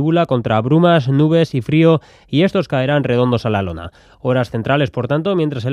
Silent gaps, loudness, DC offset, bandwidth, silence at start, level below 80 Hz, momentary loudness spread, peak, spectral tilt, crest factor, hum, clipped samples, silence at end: none; -16 LUFS; under 0.1%; 10 kHz; 0 s; -48 dBFS; 7 LU; 0 dBFS; -8 dB/octave; 14 dB; none; under 0.1%; 0 s